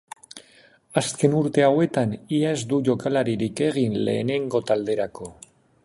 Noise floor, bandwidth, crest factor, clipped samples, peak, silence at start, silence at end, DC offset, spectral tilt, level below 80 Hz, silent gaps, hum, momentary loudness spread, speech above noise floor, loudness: -55 dBFS; 11.5 kHz; 20 dB; under 0.1%; -4 dBFS; 0.35 s; 0.55 s; under 0.1%; -6 dB/octave; -60 dBFS; none; none; 20 LU; 33 dB; -23 LUFS